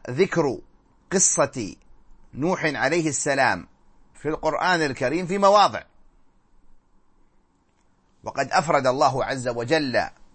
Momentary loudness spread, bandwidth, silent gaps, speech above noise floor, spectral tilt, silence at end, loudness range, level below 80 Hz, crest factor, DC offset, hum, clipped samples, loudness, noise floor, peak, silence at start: 15 LU; 8.8 kHz; none; 41 dB; -3.5 dB/octave; 0.1 s; 4 LU; -52 dBFS; 20 dB; under 0.1%; none; under 0.1%; -22 LUFS; -63 dBFS; -4 dBFS; 0.05 s